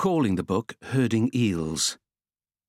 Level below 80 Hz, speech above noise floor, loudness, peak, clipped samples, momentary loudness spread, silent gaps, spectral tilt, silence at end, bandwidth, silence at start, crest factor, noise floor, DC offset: -58 dBFS; over 65 dB; -25 LUFS; -12 dBFS; under 0.1%; 6 LU; none; -5 dB/octave; 0.75 s; 15.5 kHz; 0 s; 14 dB; under -90 dBFS; under 0.1%